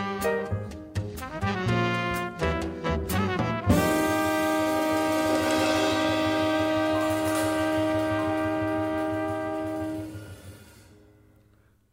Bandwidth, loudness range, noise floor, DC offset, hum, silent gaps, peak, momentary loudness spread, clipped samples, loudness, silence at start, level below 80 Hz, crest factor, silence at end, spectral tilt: 16 kHz; 6 LU; -61 dBFS; under 0.1%; none; none; -10 dBFS; 10 LU; under 0.1%; -26 LUFS; 0 s; -46 dBFS; 18 dB; 1.2 s; -5.5 dB/octave